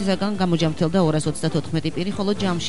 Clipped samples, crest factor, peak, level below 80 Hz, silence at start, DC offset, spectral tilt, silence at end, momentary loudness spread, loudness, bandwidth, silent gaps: under 0.1%; 14 dB; -8 dBFS; -48 dBFS; 0 s; 2%; -6 dB/octave; 0 s; 5 LU; -22 LUFS; 11.5 kHz; none